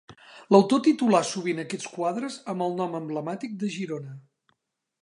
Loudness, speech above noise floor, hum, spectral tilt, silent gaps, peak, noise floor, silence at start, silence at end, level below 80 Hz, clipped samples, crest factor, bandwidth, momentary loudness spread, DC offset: -26 LUFS; 53 dB; none; -5.5 dB/octave; none; -4 dBFS; -77 dBFS; 0.1 s; 0.85 s; -78 dBFS; under 0.1%; 22 dB; 11 kHz; 13 LU; under 0.1%